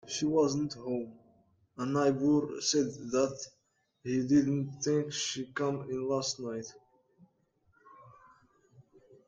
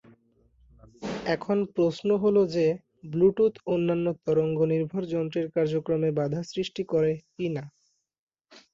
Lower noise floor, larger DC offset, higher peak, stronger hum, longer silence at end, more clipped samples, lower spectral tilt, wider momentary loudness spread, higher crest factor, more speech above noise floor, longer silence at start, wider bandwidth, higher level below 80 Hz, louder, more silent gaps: first, -72 dBFS vs -63 dBFS; neither; second, -14 dBFS vs -10 dBFS; neither; first, 0.45 s vs 0.15 s; neither; second, -4.5 dB/octave vs -7.5 dB/octave; first, 14 LU vs 9 LU; about the same, 18 dB vs 16 dB; about the same, 41 dB vs 38 dB; second, 0.05 s vs 1 s; first, 9.2 kHz vs 7.6 kHz; second, -70 dBFS vs -62 dBFS; second, -31 LUFS vs -27 LUFS; second, none vs 8.19-8.27 s